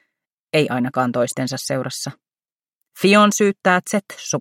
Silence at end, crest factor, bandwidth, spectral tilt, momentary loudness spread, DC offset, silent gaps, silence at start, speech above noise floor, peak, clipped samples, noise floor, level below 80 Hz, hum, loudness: 0 s; 18 dB; 16.5 kHz; -4 dB/octave; 12 LU; under 0.1%; 2.52-2.56 s, 2.75-2.81 s; 0.55 s; over 72 dB; -2 dBFS; under 0.1%; under -90 dBFS; -68 dBFS; none; -19 LUFS